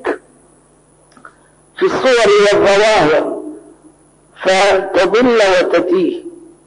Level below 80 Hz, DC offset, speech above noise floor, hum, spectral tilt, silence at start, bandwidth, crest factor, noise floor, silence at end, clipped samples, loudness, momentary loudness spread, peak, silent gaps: -48 dBFS; under 0.1%; 38 dB; none; -3.5 dB/octave; 0.05 s; 10.5 kHz; 10 dB; -49 dBFS; 0.3 s; under 0.1%; -12 LUFS; 13 LU; -4 dBFS; none